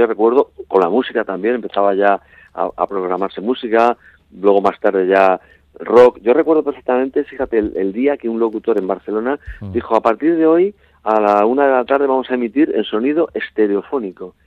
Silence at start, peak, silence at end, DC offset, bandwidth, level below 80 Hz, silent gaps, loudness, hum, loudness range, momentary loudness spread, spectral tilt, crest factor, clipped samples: 0 s; 0 dBFS; 0.15 s; under 0.1%; 6.8 kHz; -50 dBFS; none; -16 LUFS; none; 4 LU; 9 LU; -7.5 dB/octave; 16 dB; under 0.1%